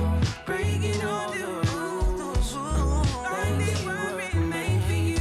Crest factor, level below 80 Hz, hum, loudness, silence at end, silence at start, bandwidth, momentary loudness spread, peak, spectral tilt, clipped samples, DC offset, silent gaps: 10 dB; -32 dBFS; none; -27 LUFS; 0 s; 0 s; 14 kHz; 3 LU; -16 dBFS; -5.5 dB/octave; under 0.1%; under 0.1%; none